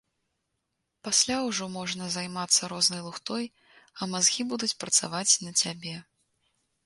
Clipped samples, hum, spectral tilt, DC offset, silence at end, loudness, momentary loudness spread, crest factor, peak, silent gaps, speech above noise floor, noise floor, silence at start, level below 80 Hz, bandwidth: under 0.1%; none; -1.5 dB/octave; under 0.1%; 0.85 s; -26 LUFS; 14 LU; 24 dB; -8 dBFS; none; 52 dB; -81 dBFS; 1.05 s; -70 dBFS; 12 kHz